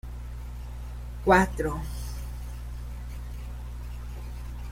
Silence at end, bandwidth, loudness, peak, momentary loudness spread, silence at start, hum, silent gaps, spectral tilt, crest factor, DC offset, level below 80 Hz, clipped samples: 0 s; 16 kHz; -31 LUFS; -6 dBFS; 18 LU; 0.05 s; 60 Hz at -35 dBFS; none; -6 dB/octave; 24 dB; under 0.1%; -36 dBFS; under 0.1%